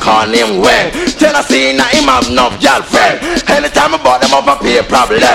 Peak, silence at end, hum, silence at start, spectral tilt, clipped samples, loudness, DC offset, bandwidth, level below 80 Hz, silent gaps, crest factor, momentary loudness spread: 0 dBFS; 0 s; none; 0 s; -3 dB/octave; 0.4%; -9 LUFS; 0.2%; 17 kHz; -32 dBFS; none; 10 dB; 2 LU